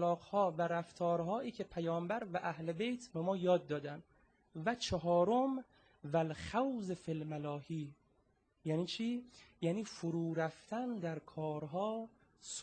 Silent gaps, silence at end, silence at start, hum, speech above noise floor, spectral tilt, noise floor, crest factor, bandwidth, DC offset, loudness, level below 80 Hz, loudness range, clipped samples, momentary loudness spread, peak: none; 0 s; 0 s; none; 38 dB; -6 dB/octave; -76 dBFS; 18 dB; 9.2 kHz; under 0.1%; -39 LUFS; -68 dBFS; 4 LU; under 0.1%; 11 LU; -20 dBFS